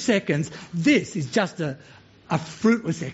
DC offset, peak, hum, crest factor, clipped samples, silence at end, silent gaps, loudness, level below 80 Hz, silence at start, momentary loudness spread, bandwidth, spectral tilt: under 0.1%; -6 dBFS; none; 18 dB; under 0.1%; 0 s; none; -24 LUFS; -60 dBFS; 0 s; 10 LU; 8 kHz; -5 dB/octave